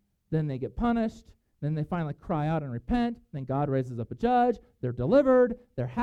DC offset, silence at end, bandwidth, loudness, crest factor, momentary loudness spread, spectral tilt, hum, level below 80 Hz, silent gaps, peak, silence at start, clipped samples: under 0.1%; 0 s; 8 kHz; -28 LUFS; 18 dB; 11 LU; -9 dB/octave; none; -48 dBFS; none; -10 dBFS; 0.3 s; under 0.1%